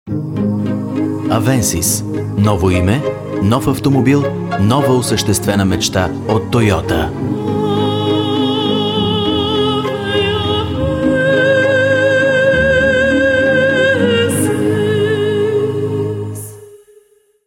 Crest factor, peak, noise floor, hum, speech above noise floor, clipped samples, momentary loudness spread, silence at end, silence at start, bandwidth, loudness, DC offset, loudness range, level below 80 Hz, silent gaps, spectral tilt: 14 dB; 0 dBFS; -50 dBFS; none; 36 dB; under 0.1%; 7 LU; 0.7 s; 0.05 s; 17.5 kHz; -14 LUFS; under 0.1%; 3 LU; -36 dBFS; none; -5 dB/octave